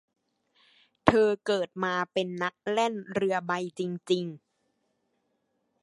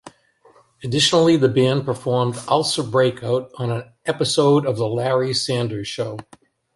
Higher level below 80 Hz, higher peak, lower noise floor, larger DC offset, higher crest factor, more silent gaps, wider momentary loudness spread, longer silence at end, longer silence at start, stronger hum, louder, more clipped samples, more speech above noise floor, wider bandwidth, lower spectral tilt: about the same, -60 dBFS vs -58 dBFS; about the same, -2 dBFS vs -4 dBFS; first, -76 dBFS vs -54 dBFS; neither; first, 28 dB vs 16 dB; neither; second, 8 LU vs 11 LU; first, 1.45 s vs 0.55 s; first, 1.05 s vs 0.05 s; neither; second, -28 LUFS vs -19 LUFS; neither; first, 48 dB vs 35 dB; about the same, 11.5 kHz vs 11.5 kHz; about the same, -5.5 dB/octave vs -5 dB/octave